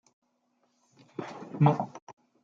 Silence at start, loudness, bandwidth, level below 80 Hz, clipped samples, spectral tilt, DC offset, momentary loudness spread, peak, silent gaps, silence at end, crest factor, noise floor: 1.2 s; -28 LUFS; 7 kHz; -76 dBFS; under 0.1%; -9 dB/octave; under 0.1%; 19 LU; -10 dBFS; 2.02-2.07 s; 0.35 s; 22 dB; -74 dBFS